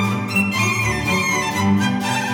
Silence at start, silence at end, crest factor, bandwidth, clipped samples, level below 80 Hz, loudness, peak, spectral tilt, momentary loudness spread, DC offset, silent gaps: 0 s; 0 s; 12 dB; over 20 kHz; under 0.1%; -44 dBFS; -18 LUFS; -6 dBFS; -4.5 dB/octave; 1 LU; under 0.1%; none